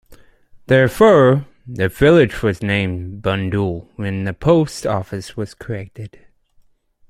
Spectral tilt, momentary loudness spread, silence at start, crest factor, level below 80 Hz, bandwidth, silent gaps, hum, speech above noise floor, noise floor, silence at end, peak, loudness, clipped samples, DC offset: -7 dB/octave; 17 LU; 0.1 s; 16 dB; -42 dBFS; 16 kHz; none; none; 38 dB; -55 dBFS; 1.05 s; -2 dBFS; -16 LUFS; under 0.1%; under 0.1%